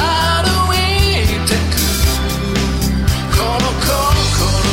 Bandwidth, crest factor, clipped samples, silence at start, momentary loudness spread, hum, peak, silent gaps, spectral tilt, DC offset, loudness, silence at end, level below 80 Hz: 16.5 kHz; 12 dB; under 0.1%; 0 s; 3 LU; none; -2 dBFS; none; -4 dB/octave; under 0.1%; -15 LUFS; 0 s; -20 dBFS